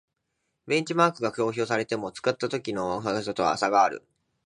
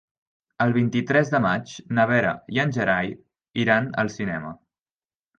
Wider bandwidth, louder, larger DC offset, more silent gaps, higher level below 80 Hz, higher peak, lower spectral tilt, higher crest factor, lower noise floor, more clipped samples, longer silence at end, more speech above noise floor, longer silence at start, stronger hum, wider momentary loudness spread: first, 11 kHz vs 7.6 kHz; second, -26 LUFS vs -23 LUFS; neither; second, none vs 3.50-3.54 s; second, -64 dBFS vs -58 dBFS; about the same, -6 dBFS vs -6 dBFS; second, -4.5 dB/octave vs -6.5 dB/octave; about the same, 22 dB vs 18 dB; second, -79 dBFS vs under -90 dBFS; neither; second, 0.45 s vs 0.85 s; second, 53 dB vs over 67 dB; about the same, 0.65 s vs 0.6 s; neither; second, 7 LU vs 11 LU